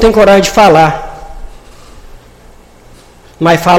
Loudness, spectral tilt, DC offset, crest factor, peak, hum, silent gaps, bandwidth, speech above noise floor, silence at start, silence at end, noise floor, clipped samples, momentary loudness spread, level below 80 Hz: -7 LUFS; -5 dB/octave; under 0.1%; 10 dB; 0 dBFS; none; none; 16.5 kHz; 32 dB; 0 s; 0 s; -38 dBFS; 0.7%; 20 LU; -28 dBFS